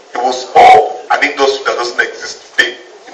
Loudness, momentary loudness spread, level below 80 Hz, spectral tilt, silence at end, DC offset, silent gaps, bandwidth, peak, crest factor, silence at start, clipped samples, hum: -11 LUFS; 12 LU; -52 dBFS; -1.5 dB/octave; 0 s; under 0.1%; none; 9.6 kHz; 0 dBFS; 12 dB; 0.15 s; 1%; none